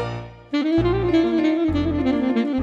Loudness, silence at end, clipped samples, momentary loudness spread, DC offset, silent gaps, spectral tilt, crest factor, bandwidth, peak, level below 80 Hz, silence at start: -21 LUFS; 0 s; under 0.1%; 8 LU; under 0.1%; none; -8 dB/octave; 12 dB; 7.2 kHz; -8 dBFS; -38 dBFS; 0 s